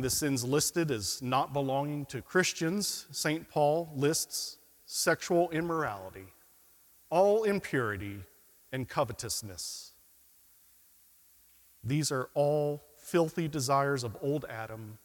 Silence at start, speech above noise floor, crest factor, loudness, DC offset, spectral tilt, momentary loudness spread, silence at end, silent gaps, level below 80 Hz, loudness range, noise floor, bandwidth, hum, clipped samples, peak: 0 s; 31 dB; 20 dB; -31 LUFS; under 0.1%; -4 dB/octave; 13 LU; 0.1 s; none; -64 dBFS; 8 LU; -62 dBFS; 18 kHz; none; under 0.1%; -12 dBFS